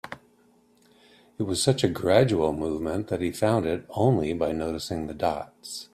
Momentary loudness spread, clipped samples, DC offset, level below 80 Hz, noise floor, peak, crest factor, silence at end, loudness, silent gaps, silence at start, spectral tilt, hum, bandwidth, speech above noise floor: 13 LU; under 0.1%; under 0.1%; -52 dBFS; -61 dBFS; -6 dBFS; 20 dB; 0.1 s; -26 LUFS; none; 0.05 s; -5.5 dB/octave; none; 14.5 kHz; 36 dB